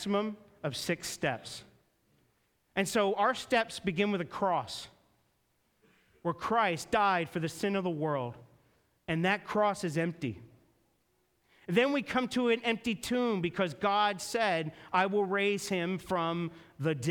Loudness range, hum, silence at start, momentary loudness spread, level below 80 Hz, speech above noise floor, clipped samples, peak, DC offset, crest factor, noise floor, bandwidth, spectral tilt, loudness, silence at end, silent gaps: 4 LU; none; 0 s; 11 LU; -66 dBFS; 43 dB; under 0.1%; -14 dBFS; under 0.1%; 20 dB; -74 dBFS; 19 kHz; -5 dB/octave; -31 LUFS; 0 s; none